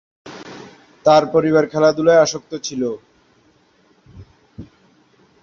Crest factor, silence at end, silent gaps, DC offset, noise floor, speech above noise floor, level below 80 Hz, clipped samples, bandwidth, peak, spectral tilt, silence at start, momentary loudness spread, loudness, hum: 18 dB; 0.8 s; none; under 0.1%; -56 dBFS; 41 dB; -56 dBFS; under 0.1%; 7.4 kHz; 0 dBFS; -5 dB/octave; 0.25 s; 24 LU; -16 LUFS; none